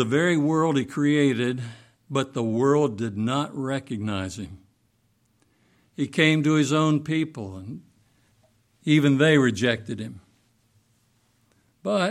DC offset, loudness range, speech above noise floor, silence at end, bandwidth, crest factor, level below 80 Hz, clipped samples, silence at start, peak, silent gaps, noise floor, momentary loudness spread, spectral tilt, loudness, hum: under 0.1%; 4 LU; 44 dB; 0 s; 12 kHz; 18 dB; -64 dBFS; under 0.1%; 0 s; -6 dBFS; none; -67 dBFS; 17 LU; -6 dB/octave; -23 LUFS; none